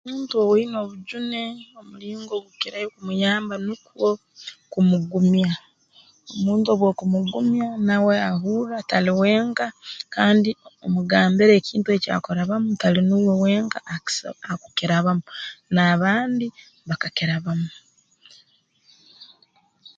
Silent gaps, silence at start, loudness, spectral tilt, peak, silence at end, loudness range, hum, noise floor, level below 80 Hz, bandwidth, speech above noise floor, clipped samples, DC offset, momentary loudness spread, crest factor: none; 0.05 s; -22 LUFS; -6 dB/octave; -2 dBFS; 0.1 s; 7 LU; none; -61 dBFS; -64 dBFS; 7.8 kHz; 40 dB; under 0.1%; under 0.1%; 14 LU; 20 dB